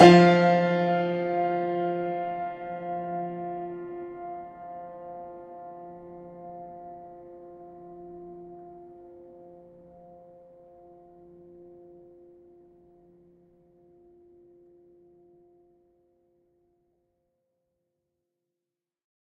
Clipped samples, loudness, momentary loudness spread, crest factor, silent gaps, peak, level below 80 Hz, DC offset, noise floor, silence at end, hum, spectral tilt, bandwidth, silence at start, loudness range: under 0.1%; -25 LUFS; 25 LU; 28 dB; none; 0 dBFS; -68 dBFS; under 0.1%; -89 dBFS; 10.4 s; none; -7 dB/octave; 9.4 kHz; 0 s; 25 LU